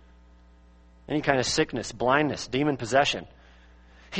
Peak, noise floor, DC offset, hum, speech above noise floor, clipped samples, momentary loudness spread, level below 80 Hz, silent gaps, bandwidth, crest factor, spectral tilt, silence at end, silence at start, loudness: -4 dBFS; -54 dBFS; under 0.1%; none; 29 dB; under 0.1%; 6 LU; -52 dBFS; none; 8.8 kHz; 24 dB; -4 dB/octave; 0 s; 1.1 s; -26 LUFS